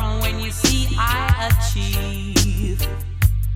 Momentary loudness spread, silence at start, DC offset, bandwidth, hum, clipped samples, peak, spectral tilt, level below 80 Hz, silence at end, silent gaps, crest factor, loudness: 5 LU; 0 s; under 0.1%; 17 kHz; none; under 0.1%; -2 dBFS; -4 dB/octave; -22 dBFS; 0 s; none; 18 dB; -20 LUFS